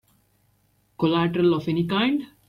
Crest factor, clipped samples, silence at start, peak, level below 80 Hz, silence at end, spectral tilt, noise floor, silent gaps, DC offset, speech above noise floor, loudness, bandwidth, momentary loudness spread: 16 dB; under 0.1%; 1 s; -10 dBFS; -60 dBFS; 0.25 s; -8 dB/octave; -65 dBFS; none; under 0.1%; 43 dB; -23 LUFS; 11 kHz; 3 LU